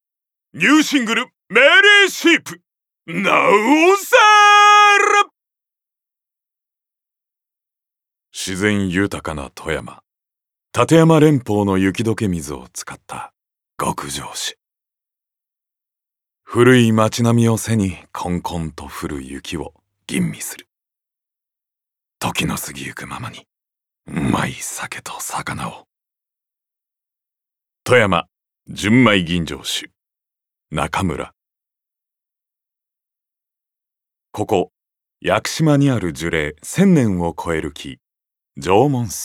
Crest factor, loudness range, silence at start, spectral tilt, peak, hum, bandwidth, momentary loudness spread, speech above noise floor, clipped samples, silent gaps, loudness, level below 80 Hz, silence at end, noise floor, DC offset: 18 dB; 16 LU; 0.55 s; -4.5 dB/octave; 0 dBFS; none; 17 kHz; 19 LU; 68 dB; under 0.1%; none; -15 LUFS; -48 dBFS; 0 s; -84 dBFS; under 0.1%